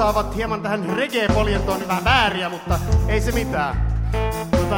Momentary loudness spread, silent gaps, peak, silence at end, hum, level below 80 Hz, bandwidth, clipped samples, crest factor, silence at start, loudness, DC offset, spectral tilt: 7 LU; none; -4 dBFS; 0 s; none; -26 dBFS; 17.5 kHz; under 0.1%; 16 dB; 0 s; -21 LUFS; under 0.1%; -5.5 dB/octave